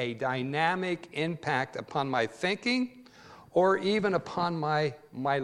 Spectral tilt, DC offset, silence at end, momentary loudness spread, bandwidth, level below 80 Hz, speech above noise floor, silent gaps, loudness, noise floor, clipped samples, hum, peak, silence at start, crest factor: -6 dB/octave; under 0.1%; 0 s; 7 LU; 11.5 kHz; -70 dBFS; 23 dB; none; -30 LUFS; -53 dBFS; under 0.1%; none; -10 dBFS; 0 s; 18 dB